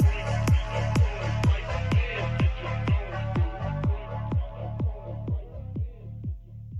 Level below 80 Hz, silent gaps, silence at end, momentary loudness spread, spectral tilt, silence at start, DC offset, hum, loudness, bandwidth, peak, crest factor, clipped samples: -32 dBFS; none; 0 s; 11 LU; -7 dB/octave; 0 s; under 0.1%; none; -28 LUFS; 11.5 kHz; -12 dBFS; 14 dB; under 0.1%